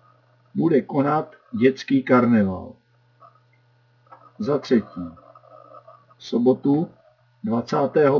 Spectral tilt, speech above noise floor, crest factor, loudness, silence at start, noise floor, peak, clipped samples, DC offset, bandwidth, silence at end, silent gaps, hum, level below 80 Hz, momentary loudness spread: -8 dB/octave; 39 dB; 18 dB; -21 LUFS; 0.55 s; -59 dBFS; -4 dBFS; under 0.1%; under 0.1%; 6 kHz; 0 s; none; none; -68 dBFS; 16 LU